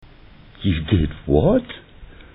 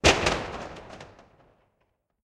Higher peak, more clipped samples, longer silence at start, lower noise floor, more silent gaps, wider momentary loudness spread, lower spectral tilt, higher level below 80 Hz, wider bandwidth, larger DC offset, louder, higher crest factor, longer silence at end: about the same, -2 dBFS vs -4 dBFS; neither; first, 0.6 s vs 0.05 s; second, -45 dBFS vs -74 dBFS; neither; second, 16 LU vs 24 LU; first, -10.5 dB/octave vs -3 dB/octave; first, -32 dBFS vs -42 dBFS; second, 4 kHz vs 13.5 kHz; neither; first, -20 LUFS vs -26 LUFS; second, 20 dB vs 26 dB; second, 0.25 s vs 1.2 s